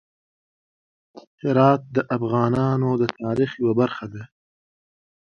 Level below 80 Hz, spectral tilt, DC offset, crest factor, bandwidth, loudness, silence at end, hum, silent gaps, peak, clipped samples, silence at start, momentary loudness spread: -58 dBFS; -8.5 dB/octave; under 0.1%; 22 dB; 6.8 kHz; -21 LUFS; 1.15 s; none; 1.27-1.38 s; 0 dBFS; under 0.1%; 1.15 s; 12 LU